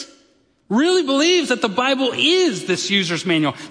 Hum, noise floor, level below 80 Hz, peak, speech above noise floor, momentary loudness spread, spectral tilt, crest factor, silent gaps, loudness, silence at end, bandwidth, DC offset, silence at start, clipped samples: none; -58 dBFS; -70 dBFS; -4 dBFS; 40 dB; 4 LU; -3.5 dB/octave; 16 dB; none; -17 LUFS; 0 s; 10.5 kHz; under 0.1%; 0 s; under 0.1%